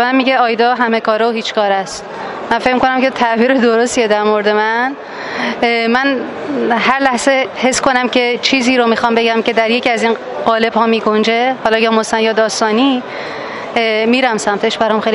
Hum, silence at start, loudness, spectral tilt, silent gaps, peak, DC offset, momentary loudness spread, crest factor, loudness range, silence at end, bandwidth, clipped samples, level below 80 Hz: none; 0 s; -13 LUFS; -3.5 dB/octave; none; 0 dBFS; under 0.1%; 7 LU; 14 dB; 2 LU; 0 s; 11.5 kHz; under 0.1%; -52 dBFS